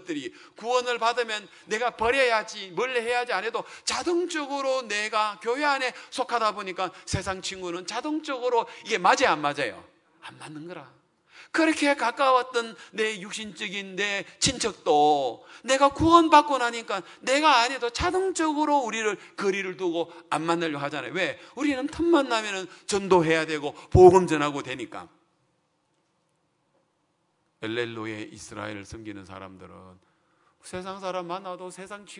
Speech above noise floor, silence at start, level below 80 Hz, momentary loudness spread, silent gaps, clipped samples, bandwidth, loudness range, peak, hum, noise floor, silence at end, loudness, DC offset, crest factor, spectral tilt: 47 dB; 0.05 s; -52 dBFS; 17 LU; none; under 0.1%; 11 kHz; 15 LU; -2 dBFS; none; -72 dBFS; 0 s; -25 LUFS; under 0.1%; 24 dB; -4 dB/octave